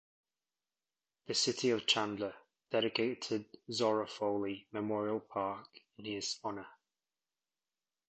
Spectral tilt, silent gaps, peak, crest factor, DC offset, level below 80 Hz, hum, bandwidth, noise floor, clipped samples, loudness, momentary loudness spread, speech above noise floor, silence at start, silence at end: -3 dB/octave; none; -16 dBFS; 22 dB; under 0.1%; -76 dBFS; none; 8.8 kHz; under -90 dBFS; under 0.1%; -36 LUFS; 11 LU; over 54 dB; 1.3 s; 1.35 s